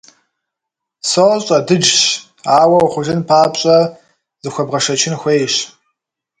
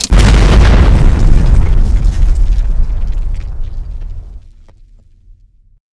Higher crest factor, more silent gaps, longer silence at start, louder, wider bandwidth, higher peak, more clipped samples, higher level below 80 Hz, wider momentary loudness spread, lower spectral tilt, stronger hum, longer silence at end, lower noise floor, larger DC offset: about the same, 14 dB vs 10 dB; neither; first, 1.05 s vs 0 s; about the same, -13 LUFS vs -12 LUFS; about the same, 11 kHz vs 11 kHz; about the same, 0 dBFS vs 0 dBFS; second, under 0.1% vs 0.9%; second, -56 dBFS vs -10 dBFS; second, 11 LU vs 19 LU; second, -3.5 dB/octave vs -6 dB/octave; neither; second, 0.7 s vs 1.55 s; first, -81 dBFS vs -42 dBFS; neither